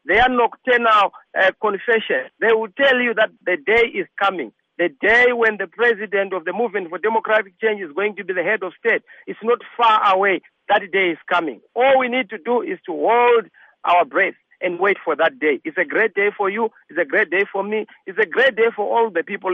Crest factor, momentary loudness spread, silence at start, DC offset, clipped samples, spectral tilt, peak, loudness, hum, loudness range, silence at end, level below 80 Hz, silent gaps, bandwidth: 14 dB; 9 LU; 0.05 s; under 0.1%; under 0.1%; -5.5 dB/octave; -4 dBFS; -18 LUFS; none; 3 LU; 0 s; -54 dBFS; none; 7.2 kHz